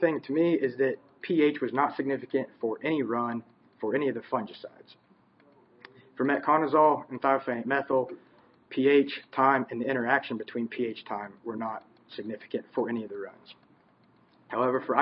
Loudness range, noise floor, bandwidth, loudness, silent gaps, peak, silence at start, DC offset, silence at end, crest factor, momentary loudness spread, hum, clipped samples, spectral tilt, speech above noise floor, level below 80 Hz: 9 LU; -63 dBFS; 5.6 kHz; -28 LUFS; none; -8 dBFS; 0 s; under 0.1%; 0 s; 22 dB; 15 LU; none; under 0.1%; -10 dB/octave; 35 dB; -80 dBFS